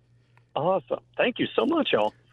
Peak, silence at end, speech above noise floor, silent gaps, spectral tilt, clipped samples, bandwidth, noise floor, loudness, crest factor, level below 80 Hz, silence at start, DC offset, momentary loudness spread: -10 dBFS; 0.25 s; 35 dB; none; -7 dB/octave; under 0.1%; 7 kHz; -61 dBFS; -26 LUFS; 16 dB; -66 dBFS; 0.55 s; under 0.1%; 7 LU